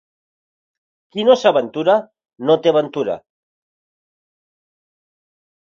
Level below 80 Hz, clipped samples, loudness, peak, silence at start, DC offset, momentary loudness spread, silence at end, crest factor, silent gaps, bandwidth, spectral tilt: -68 dBFS; under 0.1%; -17 LUFS; 0 dBFS; 1.15 s; under 0.1%; 11 LU; 2.55 s; 20 dB; none; 7.4 kHz; -5.5 dB/octave